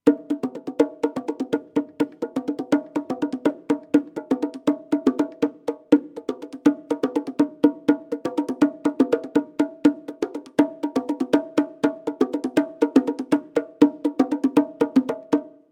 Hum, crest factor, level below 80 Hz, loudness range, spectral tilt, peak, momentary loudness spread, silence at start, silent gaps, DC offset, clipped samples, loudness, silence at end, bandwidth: none; 22 dB; -70 dBFS; 3 LU; -6.5 dB/octave; 0 dBFS; 8 LU; 0.05 s; none; under 0.1%; under 0.1%; -23 LUFS; 0.2 s; 10.5 kHz